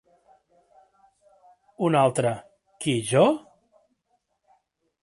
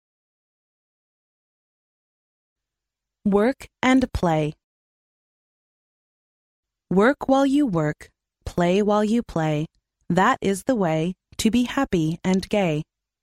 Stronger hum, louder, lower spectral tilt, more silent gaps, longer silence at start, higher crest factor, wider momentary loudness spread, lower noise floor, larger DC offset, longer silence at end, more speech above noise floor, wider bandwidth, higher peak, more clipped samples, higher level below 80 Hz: neither; about the same, -23 LUFS vs -22 LUFS; about the same, -5.5 dB/octave vs -6 dB/octave; second, none vs 4.64-6.63 s; second, 1.8 s vs 3.25 s; about the same, 20 dB vs 18 dB; about the same, 11 LU vs 9 LU; second, -73 dBFS vs -86 dBFS; neither; first, 1.65 s vs 0.4 s; second, 52 dB vs 65 dB; second, 11.5 kHz vs 15.5 kHz; about the same, -8 dBFS vs -6 dBFS; neither; second, -68 dBFS vs -48 dBFS